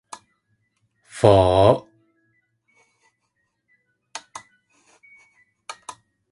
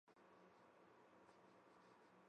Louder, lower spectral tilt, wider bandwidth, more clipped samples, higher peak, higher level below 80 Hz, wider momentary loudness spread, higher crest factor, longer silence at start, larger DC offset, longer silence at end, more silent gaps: first, -17 LUFS vs -70 LUFS; first, -6.5 dB/octave vs -5 dB/octave; first, 11.5 kHz vs 8.8 kHz; neither; first, 0 dBFS vs -54 dBFS; first, -44 dBFS vs under -90 dBFS; first, 28 LU vs 0 LU; first, 24 dB vs 16 dB; first, 1.15 s vs 0.05 s; neither; first, 0.4 s vs 0 s; neither